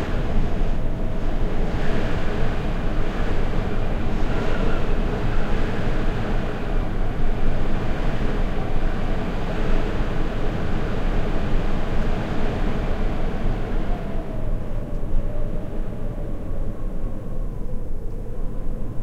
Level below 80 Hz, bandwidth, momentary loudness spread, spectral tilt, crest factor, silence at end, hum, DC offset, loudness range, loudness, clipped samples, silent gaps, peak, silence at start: -22 dBFS; 5.4 kHz; 7 LU; -7.5 dB/octave; 12 dB; 0 s; none; under 0.1%; 5 LU; -27 LUFS; under 0.1%; none; -6 dBFS; 0 s